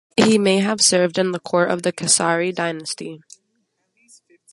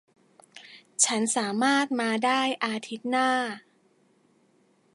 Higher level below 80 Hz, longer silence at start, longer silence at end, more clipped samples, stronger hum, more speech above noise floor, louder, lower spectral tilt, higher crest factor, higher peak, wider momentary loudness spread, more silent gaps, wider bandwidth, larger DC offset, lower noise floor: first, -64 dBFS vs -82 dBFS; second, 0.15 s vs 0.55 s; about the same, 1.35 s vs 1.35 s; neither; neither; first, 51 dB vs 39 dB; first, -18 LUFS vs -25 LUFS; about the same, -3 dB/octave vs -2 dB/octave; about the same, 20 dB vs 22 dB; first, 0 dBFS vs -6 dBFS; about the same, 13 LU vs 15 LU; neither; about the same, 11.5 kHz vs 11.5 kHz; neither; first, -70 dBFS vs -65 dBFS